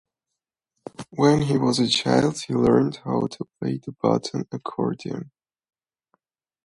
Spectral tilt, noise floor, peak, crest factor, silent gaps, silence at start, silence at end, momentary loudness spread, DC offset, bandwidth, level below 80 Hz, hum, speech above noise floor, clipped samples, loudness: -5.5 dB/octave; -85 dBFS; -4 dBFS; 20 dB; none; 1 s; 1.4 s; 13 LU; under 0.1%; 11.5 kHz; -56 dBFS; none; 63 dB; under 0.1%; -23 LUFS